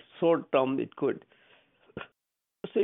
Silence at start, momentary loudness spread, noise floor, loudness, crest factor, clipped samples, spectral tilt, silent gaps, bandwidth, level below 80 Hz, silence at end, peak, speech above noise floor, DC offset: 0.15 s; 20 LU; -86 dBFS; -29 LUFS; 20 dB; under 0.1%; -10 dB/octave; none; 3.9 kHz; -74 dBFS; 0 s; -10 dBFS; 58 dB; under 0.1%